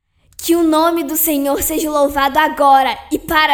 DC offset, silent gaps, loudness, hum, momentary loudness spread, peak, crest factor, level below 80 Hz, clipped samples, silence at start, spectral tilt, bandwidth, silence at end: under 0.1%; none; -14 LUFS; none; 6 LU; 0 dBFS; 14 dB; -40 dBFS; under 0.1%; 0.4 s; -2.5 dB/octave; 17.5 kHz; 0 s